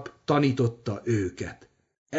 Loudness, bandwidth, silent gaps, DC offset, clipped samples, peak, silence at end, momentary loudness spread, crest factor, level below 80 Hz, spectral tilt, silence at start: -27 LUFS; 8 kHz; 1.98-2.06 s; under 0.1%; under 0.1%; -10 dBFS; 0 s; 13 LU; 18 dB; -58 dBFS; -7 dB/octave; 0 s